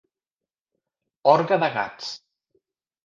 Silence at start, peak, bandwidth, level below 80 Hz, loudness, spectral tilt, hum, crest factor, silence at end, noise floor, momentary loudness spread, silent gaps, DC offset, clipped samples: 1.25 s; -4 dBFS; 7.4 kHz; -74 dBFS; -21 LUFS; -5.5 dB/octave; none; 22 dB; 0.9 s; under -90 dBFS; 16 LU; none; under 0.1%; under 0.1%